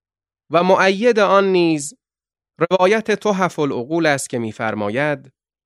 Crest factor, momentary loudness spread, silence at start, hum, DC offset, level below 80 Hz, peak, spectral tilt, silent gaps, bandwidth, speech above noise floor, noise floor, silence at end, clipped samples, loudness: 16 dB; 10 LU; 0.5 s; none; under 0.1%; -66 dBFS; -2 dBFS; -5 dB/octave; none; 12.5 kHz; 60 dB; -77 dBFS; 0.45 s; under 0.1%; -17 LUFS